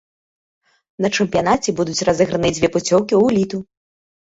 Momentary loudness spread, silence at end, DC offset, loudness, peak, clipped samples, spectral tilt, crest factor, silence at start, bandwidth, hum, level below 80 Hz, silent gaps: 6 LU; 0.7 s; under 0.1%; -17 LUFS; -2 dBFS; under 0.1%; -4.5 dB/octave; 16 dB; 1 s; 8 kHz; none; -48 dBFS; none